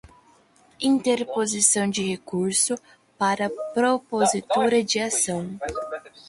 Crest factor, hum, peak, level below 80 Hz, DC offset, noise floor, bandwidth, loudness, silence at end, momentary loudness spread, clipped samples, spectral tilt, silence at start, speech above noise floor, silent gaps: 22 dB; none; -4 dBFS; -58 dBFS; under 0.1%; -57 dBFS; 12 kHz; -23 LUFS; 0.2 s; 11 LU; under 0.1%; -3 dB/octave; 0.05 s; 34 dB; none